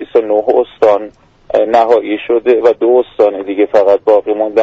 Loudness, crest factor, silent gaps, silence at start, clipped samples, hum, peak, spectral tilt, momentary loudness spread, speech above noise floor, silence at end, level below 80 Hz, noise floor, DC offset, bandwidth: -11 LUFS; 12 dB; none; 0 s; under 0.1%; none; 0 dBFS; -6 dB/octave; 5 LU; 21 dB; 0 s; -52 dBFS; -32 dBFS; under 0.1%; 7.4 kHz